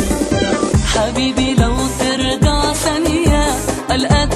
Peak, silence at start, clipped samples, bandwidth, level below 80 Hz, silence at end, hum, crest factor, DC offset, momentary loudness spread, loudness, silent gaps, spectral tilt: 0 dBFS; 0 s; under 0.1%; 13 kHz; -22 dBFS; 0 s; none; 14 dB; under 0.1%; 3 LU; -15 LUFS; none; -4.5 dB/octave